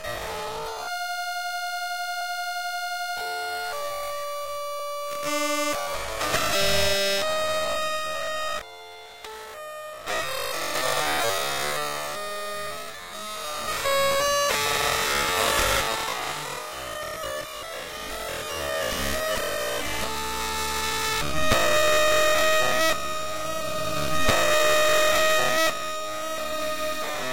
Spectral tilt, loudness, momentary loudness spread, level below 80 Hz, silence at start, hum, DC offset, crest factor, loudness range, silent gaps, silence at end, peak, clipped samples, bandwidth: -1.5 dB/octave; -25 LUFS; 12 LU; -46 dBFS; 0 s; none; 1%; 22 dB; 7 LU; none; 0 s; -6 dBFS; under 0.1%; 16 kHz